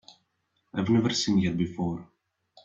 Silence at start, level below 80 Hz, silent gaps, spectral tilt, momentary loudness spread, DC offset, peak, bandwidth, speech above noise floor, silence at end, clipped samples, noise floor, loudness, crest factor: 0.75 s; -60 dBFS; none; -5.5 dB/octave; 11 LU; under 0.1%; -12 dBFS; 7.8 kHz; 50 dB; 0.6 s; under 0.1%; -75 dBFS; -27 LUFS; 16 dB